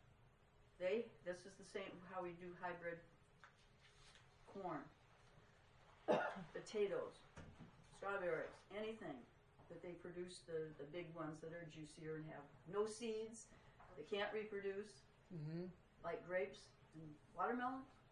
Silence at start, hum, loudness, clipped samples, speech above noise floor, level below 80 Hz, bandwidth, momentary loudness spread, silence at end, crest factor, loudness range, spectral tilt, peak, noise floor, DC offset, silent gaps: 0.05 s; none; -49 LUFS; under 0.1%; 23 dB; -76 dBFS; 11 kHz; 21 LU; 0 s; 24 dB; 7 LU; -5 dB/octave; -26 dBFS; -71 dBFS; under 0.1%; none